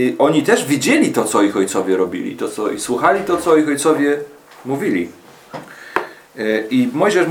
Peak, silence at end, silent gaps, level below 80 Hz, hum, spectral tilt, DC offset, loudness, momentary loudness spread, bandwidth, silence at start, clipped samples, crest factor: 0 dBFS; 0 s; none; -58 dBFS; none; -4.5 dB/octave; under 0.1%; -17 LUFS; 16 LU; 20 kHz; 0 s; under 0.1%; 16 dB